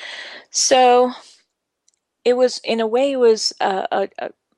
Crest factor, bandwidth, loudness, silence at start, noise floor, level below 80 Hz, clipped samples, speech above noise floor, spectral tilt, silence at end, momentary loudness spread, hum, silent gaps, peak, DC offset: 16 dB; 12 kHz; -17 LUFS; 0 s; -67 dBFS; -74 dBFS; under 0.1%; 50 dB; -1.5 dB/octave; 0.3 s; 16 LU; none; none; -2 dBFS; under 0.1%